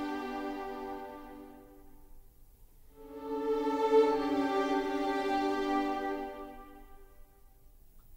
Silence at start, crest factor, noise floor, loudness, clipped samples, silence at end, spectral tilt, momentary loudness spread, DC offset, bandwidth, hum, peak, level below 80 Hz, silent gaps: 0 s; 20 dB; -58 dBFS; -32 LUFS; under 0.1%; 0 s; -4.5 dB/octave; 22 LU; under 0.1%; 16 kHz; none; -14 dBFS; -56 dBFS; none